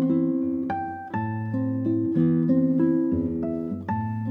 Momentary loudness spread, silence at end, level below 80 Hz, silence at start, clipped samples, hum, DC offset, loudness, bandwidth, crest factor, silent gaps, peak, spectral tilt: 8 LU; 0 s; -54 dBFS; 0 s; under 0.1%; none; under 0.1%; -25 LUFS; 3.8 kHz; 14 dB; none; -10 dBFS; -11.5 dB/octave